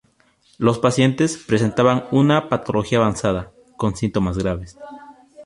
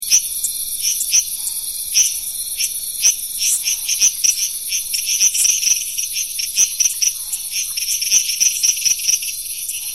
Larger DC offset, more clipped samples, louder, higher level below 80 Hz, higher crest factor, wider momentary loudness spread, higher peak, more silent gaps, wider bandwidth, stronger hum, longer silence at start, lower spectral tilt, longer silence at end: second, under 0.1% vs 0.4%; neither; second, -19 LUFS vs -16 LUFS; first, -42 dBFS vs -54 dBFS; about the same, 18 dB vs 18 dB; first, 12 LU vs 8 LU; about the same, -2 dBFS vs 0 dBFS; neither; second, 11.5 kHz vs 16.5 kHz; neither; first, 0.6 s vs 0 s; first, -6 dB/octave vs 4.5 dB/octave; about the same, 0 s vs 0 s